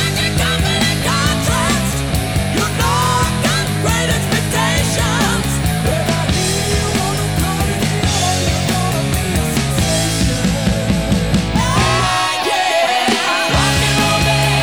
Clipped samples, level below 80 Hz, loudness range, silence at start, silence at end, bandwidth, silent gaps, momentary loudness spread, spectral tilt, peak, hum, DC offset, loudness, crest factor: under 0.1%; -26 dBFS; 2 LU; 0 s; 0 s; over 20 kHz; none; 4 LU; -4 dB/octave; 0 dBFS; none; 0.5%; -15 LUFS; 14 dB